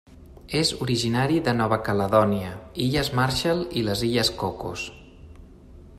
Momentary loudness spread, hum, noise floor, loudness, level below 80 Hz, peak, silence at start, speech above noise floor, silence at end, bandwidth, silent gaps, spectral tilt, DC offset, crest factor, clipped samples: 10 LU; none; -46 dBFS; -24 LUFS; -46 dBFS; -6 dBFS; 0.1 s; 23 dB; 0 s; 14.5 kHz; none; -5 dB/octave; under 0.1%; 20 dB; under 0.1%